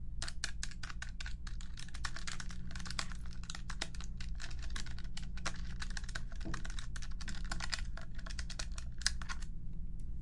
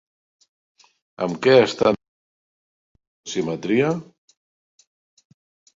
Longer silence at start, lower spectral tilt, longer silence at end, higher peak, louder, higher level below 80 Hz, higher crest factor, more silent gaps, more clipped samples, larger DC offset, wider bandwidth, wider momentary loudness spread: second, 0 s vs 1.2 s; second, -2.5 dB/octave vs -5.5 dB/octave; second, 0 s vs 1.75 s; second, -14 dBFS vs -2 dBFS; second, -44 LUFS vs -20 LUFS; first, -42 dBFS vs -62 dBFS; about the same, 26 dB vs 22 dB; second, none vs 2.08-2.95 s, 3.07-3.24 s; neither; neither; first, 11.5 kHz vs 7.8 kHz; second, 7 LU vs 14 LU